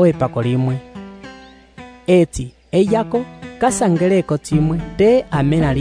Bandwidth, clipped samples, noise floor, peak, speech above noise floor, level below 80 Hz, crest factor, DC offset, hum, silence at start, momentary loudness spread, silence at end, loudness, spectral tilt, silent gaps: 11 kHz; under 0.1%; -41 dBFS; -2 dBFS; 25 dB; -38 dBFS; 14 dB; under 0.1%; none; 0 s; 17 LU; 0 s; -17 LUFS; -7 dB/octave; none